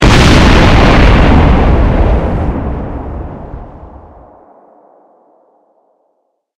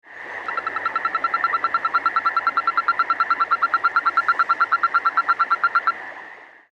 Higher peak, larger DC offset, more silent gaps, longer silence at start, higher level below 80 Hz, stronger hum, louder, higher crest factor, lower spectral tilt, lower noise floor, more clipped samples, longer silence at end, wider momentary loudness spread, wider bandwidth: first, 0 dBFS vs -6 dBFS; neither; neither; about the same, 0 s vs 0.05 s; first, -14 dBFS vs -70 dBFS; neither; first, -9 LUFS vs -20 LUFS; second, 10 dB vs 16 dB; first, -6 dB/octave vs -2.5 dB/octave; first, -62 dBFS vs -42 dBFS; first, 0.4% vs under 0.1%; first, 2.7 s vs 0.25 s; first, 19 LU vs 9 LU; first, 12 kHz vs 7.4 kHz